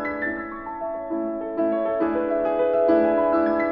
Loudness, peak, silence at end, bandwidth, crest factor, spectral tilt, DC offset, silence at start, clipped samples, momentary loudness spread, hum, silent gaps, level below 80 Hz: -23 LUFS; -8 dBFS; 0 s; 5.4 kHz; 16 dB; -9 dB/octave; under 0.1%; 0 s; under 0.1%; 11 LU; none; none; -54 dBFS